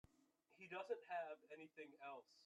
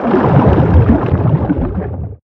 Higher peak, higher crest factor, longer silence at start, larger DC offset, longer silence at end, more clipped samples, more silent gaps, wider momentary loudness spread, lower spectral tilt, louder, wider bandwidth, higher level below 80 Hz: second, -36 dBFS vs 0 dBFS; first, 18 dB vs 12 dB; first, 0.5 s vs 0 s; neither; about the same, 0 s vs 0.1 s; neither; neither; about the same, 11 LU vs 10 LU; second, -4.5 dB/octave vs -11 dB/octave; second, -53 LUFS vs -12 LUFS; first, 11 kHz vs 5 kHz; second, -90 dBFS vs -22 dBFS